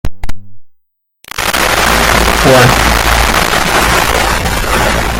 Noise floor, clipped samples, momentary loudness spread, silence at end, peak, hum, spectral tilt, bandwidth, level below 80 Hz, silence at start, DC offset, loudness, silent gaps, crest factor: -57 dBFS; 0.2%; 10 LU; 0 s; 0 dBFS; none; -3 dB/octave; 17.5 kHz; -20 dBFS; 0.05 s; under 0.1%; -9 LUFS; none; 10 dB